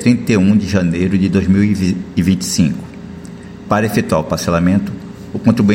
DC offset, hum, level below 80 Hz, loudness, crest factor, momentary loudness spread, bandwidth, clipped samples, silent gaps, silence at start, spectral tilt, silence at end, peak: under 0.1%; none; -40 dBFS; -15 LUFS; 14 dB; 18 LU; 16.5 kHz; under 0.1%; none; 0 s; -6.5 dB/octave; 0 s; 0 dBFS